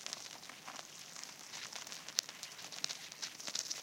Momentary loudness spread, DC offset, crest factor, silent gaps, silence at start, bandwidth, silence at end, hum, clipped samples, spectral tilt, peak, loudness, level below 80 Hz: 10 LU; under 0.1%; 38 dB; none; 0 s; 17 kHz; 0 s; none; under 0.1%; 1 dB/octave; -8 dBFS; -43 LUFS; under -90 dBFS